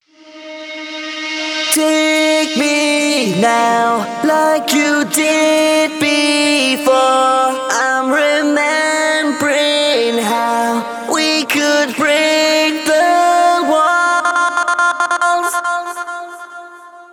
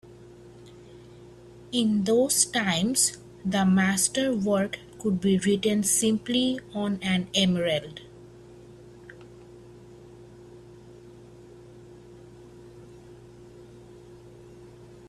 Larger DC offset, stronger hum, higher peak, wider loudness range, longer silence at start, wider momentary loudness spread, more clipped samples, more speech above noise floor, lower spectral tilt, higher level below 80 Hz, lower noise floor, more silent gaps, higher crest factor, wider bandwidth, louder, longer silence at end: neither; second, none vs 50 Hz at -50 dBFS; first, 0 dBFS vs -6 dBFS; second, 2 LU vs 6 LU; first, 0.25 s vs 0.05 s; about the same, 9 LU vs 11 LU; neither; about the same, 23 dB vs 24 dB; second, -2 dB/octave vs -3.5 dB/octave; second, -70 dBFS vs -60 dBFS; second, -36 dBFS vs -48 dBFS; neither; second, 14 dB vs 24 dB; first, over 20 kHz vs 14.5 kHz; first, -13 LUFS vs -24 LUFS; about the same, 0.1 s vs 0 s